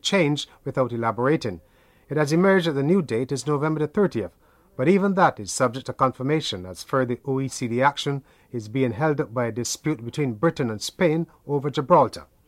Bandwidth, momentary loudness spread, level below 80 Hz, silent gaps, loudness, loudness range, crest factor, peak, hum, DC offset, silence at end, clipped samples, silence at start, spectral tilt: 15.5 kHz; 10 LU; -58 dBFS; none; -23 LUFS; 3 LU; 18 dB; -4 dBFS; none; under 0.1%; 0.25 s; under 0.1%; 0.05 s; -5.5 dB/octave